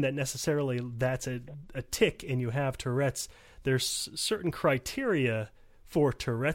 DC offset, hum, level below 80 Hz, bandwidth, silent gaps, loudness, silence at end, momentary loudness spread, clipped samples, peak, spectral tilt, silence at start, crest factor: under 0.1%; none; -54 dBFS; 16.5 kHz; none; -31 LUFS; 0 s; 9 LU; under 0.1%; -12 dBFS; -4.5 dB/octave; 0 s; 18 dB